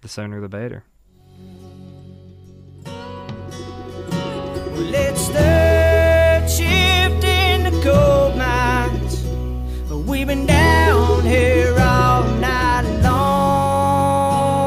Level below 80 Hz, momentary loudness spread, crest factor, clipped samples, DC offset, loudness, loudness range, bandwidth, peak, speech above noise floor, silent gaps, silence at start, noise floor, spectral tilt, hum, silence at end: -24 dBFS; 18 LU; 12 dB; under 0.1%; under 0.1%; -16 LUFS; 18 LU; 16 kHz; -4 dBFS; 25 dB; none; 0.05 s; -45 dBFS; -5.5 dB/octave; none; 0 s